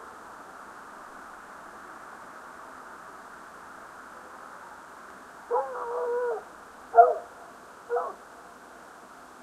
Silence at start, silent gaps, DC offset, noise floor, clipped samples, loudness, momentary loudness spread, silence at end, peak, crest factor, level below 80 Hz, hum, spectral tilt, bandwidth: 0 s; none; under 0.1%; -48 dBFS; under 0.1%; -26 LUFS; 21 LU; 0.15 s; -4 dBFS; 28 dB; -72 dBFS; none; -3.5 dB/octave; 13.5 kHz